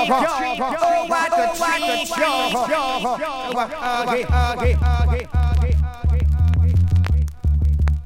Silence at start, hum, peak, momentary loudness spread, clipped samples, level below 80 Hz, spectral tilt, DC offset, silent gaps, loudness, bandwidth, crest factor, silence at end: 0 s; none; -4 dBFS; 5 LU; under 0.1%; -24 dBFS; -5.5 dB/octave; under 0.1%; none; -20 LUFS; 16 kHz; 14 dB; 0 s